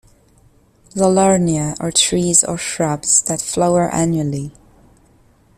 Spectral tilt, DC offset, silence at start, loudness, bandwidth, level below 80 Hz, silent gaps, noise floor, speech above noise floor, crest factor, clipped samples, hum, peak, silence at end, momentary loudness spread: -4 dB/octave; under 0.1%; 0.95 s; -15 LUFS; 14.5 kHz; -46 dBFS; none; -52 dBFS; 36 dB; 18 dB; under 0.1%; none; 0 dBFS; 1.05 s; 8 LU